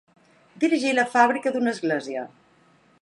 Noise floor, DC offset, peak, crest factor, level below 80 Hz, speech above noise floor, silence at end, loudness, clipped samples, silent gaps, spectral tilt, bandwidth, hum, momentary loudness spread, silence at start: -59 dBFS; under 0.1%; -4 dBFS; 20 dB; -80 dBFS; 36 dB; 0.75 s; -23 LUFS; under 0.1%; none; -4 dB/octave; 11.5 kHz; none; 14 LU; 0.55 s